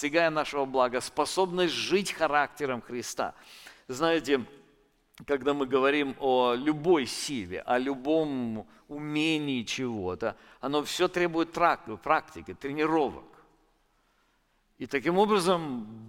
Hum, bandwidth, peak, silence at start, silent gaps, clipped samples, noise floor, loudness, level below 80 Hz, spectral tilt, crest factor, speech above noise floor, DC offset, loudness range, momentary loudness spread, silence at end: none; 16.5 kHz; -8 dBFS; 0 s; none; under 0.1%; -70 dBFS; -28 LUFS; -62 dBFS; -4.5 dB/octave; 20 dB; 42 dB; under 0.1%; 3 LU; 12 LU; 0 s